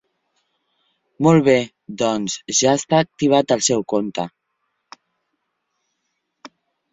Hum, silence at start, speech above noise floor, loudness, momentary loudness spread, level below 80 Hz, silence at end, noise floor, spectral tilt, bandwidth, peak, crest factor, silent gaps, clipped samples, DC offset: none; 1.2 s; 57 dB; -18 LUFS; 11 LU; -60 dBFS; 0.45 s; -74 dBFS; -4.5 dB/octave; 8.4 kHz; -2 dBFS; 20 dB; none; under 0.1%; under 0.1%